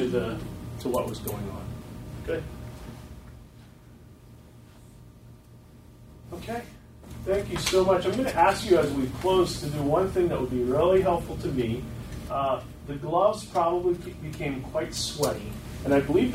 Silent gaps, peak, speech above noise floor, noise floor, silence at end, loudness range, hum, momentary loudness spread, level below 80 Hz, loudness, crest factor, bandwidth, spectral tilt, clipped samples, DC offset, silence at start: none; -8 dBFS; 24 dB; -50 dBFS; 0 s; 17 LU; none; 18 LU; -46 dBFS; -27 LUFS; 20 dB; 16 kHz; -5.5 dB/octave; under 0.1%; under 0.1%; 0 s